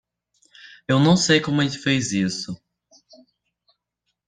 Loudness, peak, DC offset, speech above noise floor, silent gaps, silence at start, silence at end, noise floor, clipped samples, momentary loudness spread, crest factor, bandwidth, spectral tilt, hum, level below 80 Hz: -20 LUFS; -4 dBFS; under 0.1%; 58 dB; none; 0.9 s; 1.7 s; -78 dBFS; under 0.1%; 18 LU; 20 dB; 9.8 kHz; -4.5 dB/octave; none; -58 dBFS